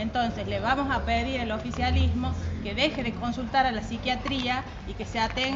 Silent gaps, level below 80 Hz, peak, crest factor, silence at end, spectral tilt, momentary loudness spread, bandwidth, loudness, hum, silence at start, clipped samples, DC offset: none; -36 dBFS; -10 dBFS; 18 dB; 0 s; -3.5 dB/octave; 6 LU; 7.8 kHz; -28 LUFS; none; 0 s; under 0.1%; under 0.1%